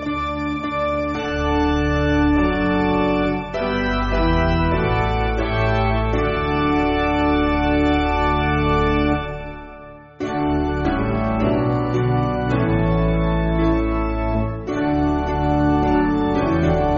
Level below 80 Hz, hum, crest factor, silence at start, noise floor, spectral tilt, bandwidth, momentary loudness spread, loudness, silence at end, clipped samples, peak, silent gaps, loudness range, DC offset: -28 dBFS; none; 14 dB; 0 s; -39 dBFS; -6 dB/octave; 7.4 kHz; 5 LU; -20 LUFS; 0 s; under 0.1%; -4 dBFS; none; 2 LU; under 0.1%